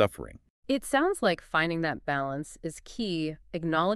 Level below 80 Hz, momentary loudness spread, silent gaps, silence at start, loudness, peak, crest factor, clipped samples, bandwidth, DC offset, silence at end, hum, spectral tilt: -54 dBFS; 13 LU; 0.50-0.63 s; 0 s; -30 LUFS; -10 dBFS; 20 dB; under 0.1%; 13.5 kHz; under 0.1%; 0 s; none; -5 dB/octave